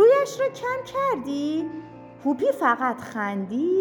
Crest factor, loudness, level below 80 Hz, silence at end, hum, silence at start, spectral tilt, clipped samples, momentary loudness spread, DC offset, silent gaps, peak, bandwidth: 16 dB; -25 LUFS; -66 dBFS; 0 s; none; 0 s; -5.5 dB/octave; under 0.1%; 8 LU; under 0.1%; none; -8 dBFS; 19 kHz